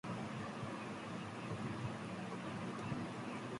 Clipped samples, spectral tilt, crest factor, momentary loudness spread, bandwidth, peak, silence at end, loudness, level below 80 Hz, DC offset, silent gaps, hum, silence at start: under 0.1%; -6 dB/octave; 14 dB; 2 LU; 11.5 kHz; -30 dBFS; 0 s; -45 LUFS; -70 dBFS; under 0.1%; none; none; 0.05 s